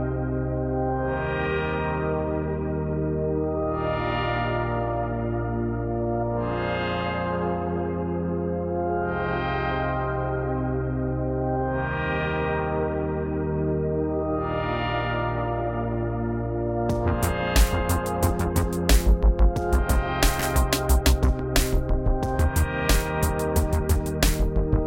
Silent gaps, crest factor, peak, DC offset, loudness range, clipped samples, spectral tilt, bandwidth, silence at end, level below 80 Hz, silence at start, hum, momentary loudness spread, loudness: none; 20 dB; -4 dBFS; under 0.1%; 4 LU; under 0.1%; -5.5 dB/octave; 16.5 kHz; 0 s; -28 dBFS; 0 s; none; 5 LU; -25 LUFS